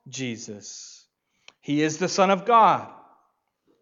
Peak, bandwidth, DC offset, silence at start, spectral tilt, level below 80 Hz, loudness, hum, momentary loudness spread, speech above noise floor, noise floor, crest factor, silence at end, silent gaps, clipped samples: -6 dBFS; 7.8 kHz; under 0.1%; 0.05 s; -4.5 dB/octave; -80 dBFS; -22 LUFS; none; 24 LU; 47 dB; -70 dBFS; 20 dB; 0.9 s; none; under 0.1%